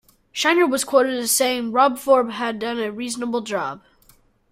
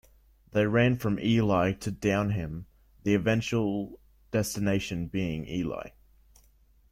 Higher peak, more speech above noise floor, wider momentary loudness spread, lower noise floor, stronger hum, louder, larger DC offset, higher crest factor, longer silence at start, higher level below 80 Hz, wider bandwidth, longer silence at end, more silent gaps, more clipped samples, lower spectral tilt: first, -4 dBFS vs -10 dBFS; about the same, 36 dB vs 34 dB; about the same, 9 LU vs 11 LU; second, -56 dBFS vs -61 dBFS; neither; first, -20 LUFS vs -28 LUFS; neither; about the same, 18 dB vs 18 dB; second, 0.35 s vs 0.55 s; second, -62 dBFS vs -52 dBFS; about the same, 16 kHz vs 15.5 kHz; second, 0.75 s vs 1 s; neither; neither; second, -2 dB/octave vs -6 dB/octave